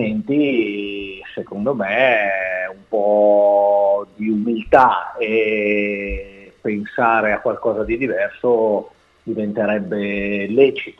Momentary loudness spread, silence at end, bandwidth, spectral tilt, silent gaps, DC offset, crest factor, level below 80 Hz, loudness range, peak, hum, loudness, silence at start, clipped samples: 12 LU; 0.1 s; 6 kHz; -8 dB/octave; none; under 0.1%; 18 dB; -44 dBFS; 4 LU; 0 dBFS; none; -18 LUFS; 0 s; under 0.1%